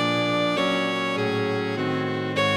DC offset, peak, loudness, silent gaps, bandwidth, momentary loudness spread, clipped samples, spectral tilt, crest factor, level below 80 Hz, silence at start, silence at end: under 0.1%; -12 dBFS; -24 LUFS; none; 16 kHz; 3 LU; under 0.1%; -5.5 dB/octave; 12 dB; -64 dBFS; 0 s; 0 s